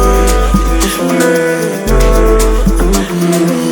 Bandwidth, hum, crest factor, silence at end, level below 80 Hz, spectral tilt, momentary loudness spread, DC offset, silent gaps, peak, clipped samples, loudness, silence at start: over 20 kHz; none; 10 dB; 0 s; -12 dBFS; -5 dB/octave; 3 LU; under 0.1%; none; 0 dBFS; under 0.1%; -11 LUFS; 0 s